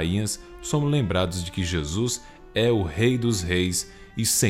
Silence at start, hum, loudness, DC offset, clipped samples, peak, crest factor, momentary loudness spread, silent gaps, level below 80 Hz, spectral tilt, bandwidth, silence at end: 0 s; none; -25 LUFS; under 0.1%; under 0.1%; -8 dBFS; 16 dB; 7 LU; none; -42 dBFS; -4.5 dB/octave; 16 kHz; 0 s